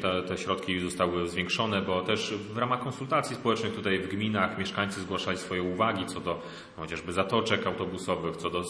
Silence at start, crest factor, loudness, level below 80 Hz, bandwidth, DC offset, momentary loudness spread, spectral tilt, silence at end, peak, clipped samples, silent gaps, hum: 0 s; 22 dB; -30 LUFS; -60 dBFS; 11 kHz; under 0.1%; 5 LU; -5 dB/octave; 0 s; -8 dBFS; under 0.1%; none; none